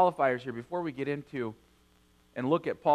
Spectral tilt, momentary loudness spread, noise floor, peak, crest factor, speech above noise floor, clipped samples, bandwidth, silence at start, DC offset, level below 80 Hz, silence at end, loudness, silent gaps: -7.5 dB/octave; 9 LU; -64 dBFS; -12 dBFS; 18 dB; 35 dB; under 0.1%; 12.5 kHz; 0 s; under 0.1%; -68 dBFS; 0 s; -32 LUFS; none